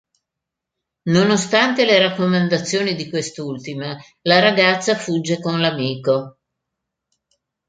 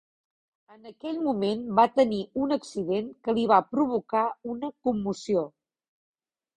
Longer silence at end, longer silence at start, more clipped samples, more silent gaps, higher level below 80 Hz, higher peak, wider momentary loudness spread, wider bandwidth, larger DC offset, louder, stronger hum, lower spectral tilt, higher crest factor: first, 1.4 s vs 1.1 s; first, 1.05 s vs 0.85 s; neither; neither; about the same, -62 dBFS vs -66 dBFS; first, -2 dBFS vs -6 dBFS; first, 14 LU vs 10 LU; second, 9.4 kHz vs 10.5 kHz; neither; first, -18 LUFS vs -27 LUFS; neither; second, -4.5 dB/octave vs -6.5 dB/octave; about the same, 18 dB vs 22 dB